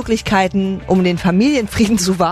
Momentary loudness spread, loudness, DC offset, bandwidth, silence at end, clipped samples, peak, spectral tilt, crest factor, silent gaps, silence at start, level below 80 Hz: 2 LU; -15 LUFS; under 0.1%; 13.5 kHz; 0 s; under 0.1%; -2 dBFS; -5.5 dB/octave; 12 dB; none; 0 s; -36 dBFS